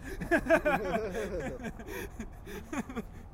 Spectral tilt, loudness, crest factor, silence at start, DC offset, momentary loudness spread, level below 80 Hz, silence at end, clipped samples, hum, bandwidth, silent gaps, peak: -5.5 dB/octave; -33 LUFS; 20 dB; 0 s; under 0.1%; 16 LU; -46 dBFS; 0 s; under 0.1%; none; 16 kHz; none; -14 dBFS